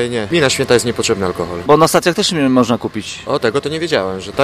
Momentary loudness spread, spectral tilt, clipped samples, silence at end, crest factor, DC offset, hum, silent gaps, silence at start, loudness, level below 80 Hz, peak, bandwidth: 9 LU; -4 dB/octave; under 0.1%; 0 s; 14 dB; under 0.1%; none; none; 0 s; -15 LUFS; -46 dBFS; 0 dBFS; 15.5 kHz